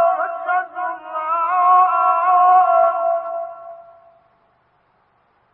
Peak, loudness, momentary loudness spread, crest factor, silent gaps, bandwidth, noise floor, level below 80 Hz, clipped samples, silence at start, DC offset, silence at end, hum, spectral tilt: -4 dBFS; -16 LUFS; 14 LU; 14 dB; none; 3.6 kHz; -61 dBFS; -74 dBFS; under 0.1%; 0 s; under 0.1%; 1.7 s; none; -7 dB/octave